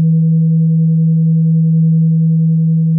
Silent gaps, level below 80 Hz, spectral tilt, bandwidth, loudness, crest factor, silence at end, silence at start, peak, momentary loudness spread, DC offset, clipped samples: none; -78 dBFS; -19.5 dB/octave; 0.5 kHz; -12 LUFS; 4 dB; 0 s; 0 s; -6 dBFS; 1 LU; under 0.1%; under 0.1%